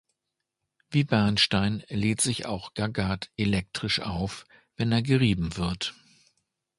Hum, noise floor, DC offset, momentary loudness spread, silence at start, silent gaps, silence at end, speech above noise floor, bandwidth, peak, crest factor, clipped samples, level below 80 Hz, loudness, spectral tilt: none; -84 dBFS; under 0.1%; 10 LU; 0.9 s; none; 0.85 s; 58 dB; 11.5 kHz; -8 dBFS; 20 dB; under 0.1%; -48 dBFS; -27 LUFS; -4.5 dB/octave